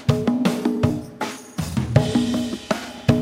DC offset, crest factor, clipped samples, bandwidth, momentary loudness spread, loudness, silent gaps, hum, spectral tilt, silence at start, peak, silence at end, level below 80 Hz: under 0.1%; 20 dB; under 0.1%; 16 kHz; 9 LU; -23 LUFS; none; none; -6.5 dB/octave; 0 s; -2 dBFS; 0 s; -42 dBFS